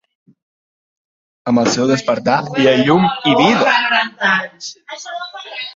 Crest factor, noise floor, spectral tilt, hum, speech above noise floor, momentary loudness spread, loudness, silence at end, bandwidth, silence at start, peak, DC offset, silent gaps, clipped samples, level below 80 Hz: 16 dB; under -90 dBFS; -4.5 dB/octave; none; over 75 dB; 16 LU; -14 LUFS; 0.05 s; 7.8 kHz; 1.45 s; 0 dBFS; under 0.1%; none; under 0.1%; -56 dBFS